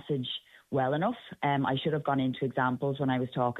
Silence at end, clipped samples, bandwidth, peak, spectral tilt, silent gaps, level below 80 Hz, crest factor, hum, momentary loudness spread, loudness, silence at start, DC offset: 0 s; under 0.1%; 4.1 kHz; -14 dBFS; -8.5 dB/octave; none; -68 dBFS; 16 dB; none; 5 LU; -30 LUFS; 0.05 s; under 0.1%